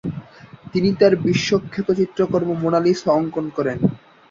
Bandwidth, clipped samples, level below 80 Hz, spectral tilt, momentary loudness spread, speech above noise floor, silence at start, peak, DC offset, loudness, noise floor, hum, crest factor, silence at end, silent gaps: 7.6 kHz; under 0.1%; -52 dBFS; -6.5 dB/octave; 8 LU; 23 dB; 0.05 s; -2 dBFS; under 0.1%; -19 LUFS; -42 dBFS; none; 18 dB; 0.35 s; none